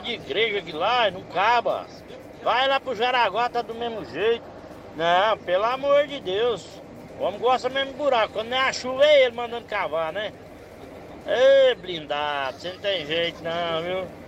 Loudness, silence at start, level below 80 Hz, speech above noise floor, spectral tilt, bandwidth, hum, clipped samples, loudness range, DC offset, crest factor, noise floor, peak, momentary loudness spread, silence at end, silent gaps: -23 LUFS; 0 s; -58 dBFS; 19 dB; -3.5 dB/octave; 9 kHz; none; under 0.1%; 2 LU; under 0.1%; 16 dB; -42 dBFS; -8 dBFS; 21 LU; 0 s; none